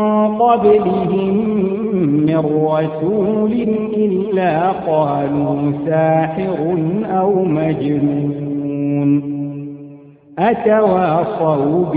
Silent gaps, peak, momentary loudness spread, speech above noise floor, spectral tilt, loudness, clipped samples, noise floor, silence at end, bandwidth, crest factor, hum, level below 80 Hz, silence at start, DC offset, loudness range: none; 0 dBFS; 6 LU; 24 dB; -13.5 dB/octave; -16 LUFS; under 0.1%; -39 dBFS; 0 s; 4.7 kHz; 14 dB; none; -52 dBFS; 0 s; under 0.1%; 3 LU